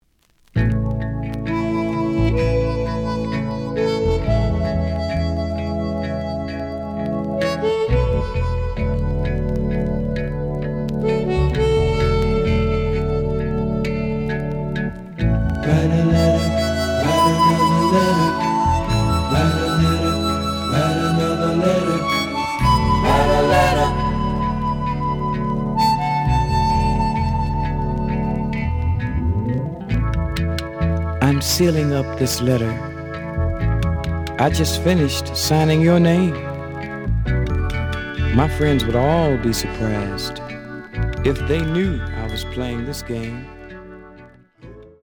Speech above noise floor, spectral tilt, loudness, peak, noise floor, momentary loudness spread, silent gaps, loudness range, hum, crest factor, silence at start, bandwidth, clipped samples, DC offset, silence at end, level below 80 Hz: 39 dB; -6 dB/octave; -20 LUFS; 0 dBFS; -58 dBFS; 10 LU; none; 5 LU; none; 18 dB; 0.55 s; over 20 kHz; under 0.1%; under 0.1%; 0.15 s; -28 dBFS